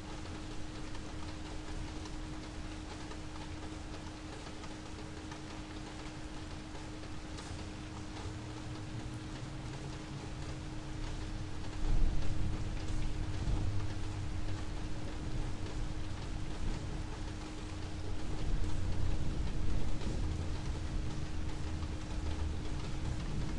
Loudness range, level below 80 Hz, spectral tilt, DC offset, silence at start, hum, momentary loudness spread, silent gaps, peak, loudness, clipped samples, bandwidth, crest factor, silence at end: 6 LU; -40 dBFS; -5.5 dB/octave; under 0.1%; 0 s; none; 7 LU; none; -18 dBFS; -42 LUFS; under 0.1%; 11 kHz; 18 dB; 0 s